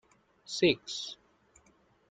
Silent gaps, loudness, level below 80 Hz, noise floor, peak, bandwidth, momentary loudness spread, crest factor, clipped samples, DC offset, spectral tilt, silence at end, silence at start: none; -31 LUFS; -70 dBFS; -67 dBFS; -12 dBFS; 9.4 kHz; 16 LU; 24 dB; under 0.1%; under 0.1%; -4 dB/octave; 0.95 s; 0.5 s